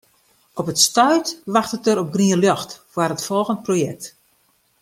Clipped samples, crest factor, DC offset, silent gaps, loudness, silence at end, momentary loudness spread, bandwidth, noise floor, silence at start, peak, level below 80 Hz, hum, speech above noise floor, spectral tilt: under 0.1%; 18 dB; under 0.1%; none; -19 LUFS; 0.75 s; 13 LU; 16.5 kHz; -62 dBFS; 0.55 s; -2 dBFS; -64 dBFS; none; 43 dB; -4 dB/octave